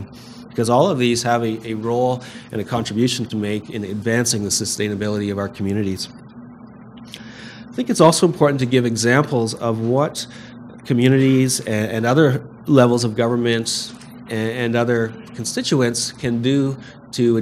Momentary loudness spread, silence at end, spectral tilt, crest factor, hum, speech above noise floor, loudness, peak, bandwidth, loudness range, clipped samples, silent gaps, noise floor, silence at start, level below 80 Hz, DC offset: 16 LU; 0 s; -5 dB/octave; 20 dB; none; 21 dB; -19 LUFS; 0 dBFS; 15.5 kHz; 5 LU; under 0.1%; none; -40 dBFS; 0 s; -56 dBFS; under 0.1%